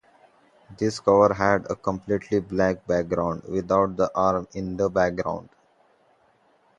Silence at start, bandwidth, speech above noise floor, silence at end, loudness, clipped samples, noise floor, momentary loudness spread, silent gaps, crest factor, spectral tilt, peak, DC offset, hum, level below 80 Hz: 0.7 s; 10 kHz; 39 dB; 1.35 s; -24 LUFS; under 0.1%; -62 dBFS; 10 LU; none; 22 dB; -6.5 dB/octave; -4 dBFS; under 0.1%; none; -50 dBFS